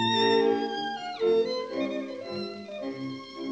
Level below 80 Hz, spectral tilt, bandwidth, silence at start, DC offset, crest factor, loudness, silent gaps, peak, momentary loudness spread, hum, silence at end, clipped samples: -78 dBFS; -5 dB/octave; 8 kHz; 0 s; under 0.1%; 16 dB; -29 LUFS; none; -12 dBFS; 14 LU; none; 0 s; under 0.1%